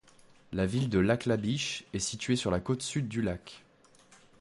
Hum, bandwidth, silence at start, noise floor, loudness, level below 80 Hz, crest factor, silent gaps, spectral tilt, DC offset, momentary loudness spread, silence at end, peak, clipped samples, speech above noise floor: none; 11.5 kHz; 0.5 s; -60 dBFS; -31 LUFS; -52 dBFS; 18 dB; none; -5 dB/octave; under 0.1%; 8 LU; 0.8 s; -14 dBFS; under 0.1%; 30 dB